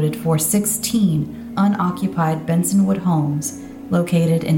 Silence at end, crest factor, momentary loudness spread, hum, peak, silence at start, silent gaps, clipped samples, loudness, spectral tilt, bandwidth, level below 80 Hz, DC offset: 0 s; 12 dB; 6 LU; none; -6 dBFS; 0 s; none; under 0.1%; -19 LUFS; -6 dB/octave; 17 kHz; -50 dBFS; under 0.1%